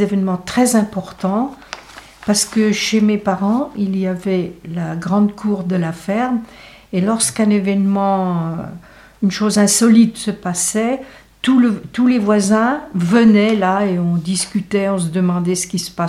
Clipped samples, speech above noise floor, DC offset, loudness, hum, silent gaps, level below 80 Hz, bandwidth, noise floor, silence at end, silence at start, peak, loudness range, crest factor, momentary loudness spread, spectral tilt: under 0.1%; 23 dB; under 0.1%; -16 LUFS; none; none; -50 dBFS; 14.5 kHz; -39 dBFS; 0 s; 0 s; 0 dBFS; 4 LU; 16 dB; 11 LU; -5 dB/octave